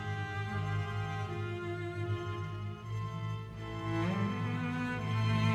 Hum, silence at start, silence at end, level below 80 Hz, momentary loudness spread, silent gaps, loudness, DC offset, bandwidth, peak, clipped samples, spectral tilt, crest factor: none; 0 s; 0 s; -58 dBFS; 7 LU; none; -36 LUFS; under 0.1%; 8.8 kHz; -18 dBFS; under 0.1%; -7 dB/octave; 16 dB